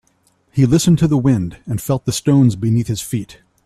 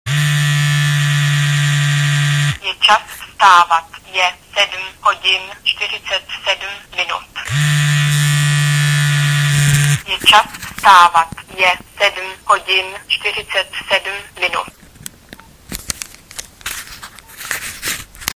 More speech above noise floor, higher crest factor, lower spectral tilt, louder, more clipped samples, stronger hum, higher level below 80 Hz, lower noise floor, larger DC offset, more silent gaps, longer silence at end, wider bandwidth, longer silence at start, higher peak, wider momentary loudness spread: first, 44 dB vs 26 dB; about the same, 14 dB vs 16 dB; first, -6.5 dB/octave vs -3.5 dB/octave; about the same, -16 LUFS vs -14 LUFS; neither; neither; about the same, -42 dBFS vs -46 dBFS; first, -60 dBFS vs -40 dBFS; neither; neither; first, 0.35 s vs 0.05 s; second, 14 kHz vs 16 kHz; first, 0.55 s vs 0.05 s; about the same, -2 dBFS vs 0 dBFS; second, 11 LU vs 16 LU